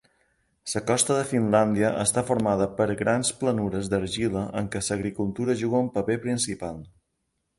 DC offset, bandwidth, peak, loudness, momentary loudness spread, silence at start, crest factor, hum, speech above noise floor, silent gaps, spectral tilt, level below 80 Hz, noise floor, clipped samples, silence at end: under 0.1%; 12 kHz; -6 dBFS; -25 LUFS; 7 LU; 0.65 s; 20 dB; none; 52 dB; none; -4.5 dB/octave; -52 dBFS; -77 dBFS; under 0.1%; 0.7 s